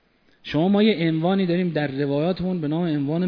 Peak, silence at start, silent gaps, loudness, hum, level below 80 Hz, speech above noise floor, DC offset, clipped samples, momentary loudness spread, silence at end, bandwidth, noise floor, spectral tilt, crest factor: -6 dBFS; 0.45 s; none; -22 LUFS; none; -56 dBFS; 23 dB; under 0.1%; under 0.1%; 6 LU; 0 s; 5.4 kHz; -44 dBFS; -9.5 dB/octave; 16 dB